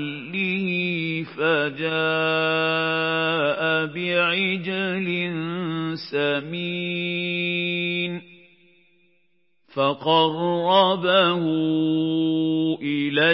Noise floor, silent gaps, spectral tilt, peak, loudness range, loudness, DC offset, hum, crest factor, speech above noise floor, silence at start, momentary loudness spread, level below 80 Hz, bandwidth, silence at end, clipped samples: -70 dBFS; none; -10 dB/octave; -4 dBFS; 5 LU; -22 LUFS; under 0.1%; none; 18 dB; 48 dB; 0 s; 8 LU; -76 dBFS; 5.8 kHz; 0 s; under 0.1%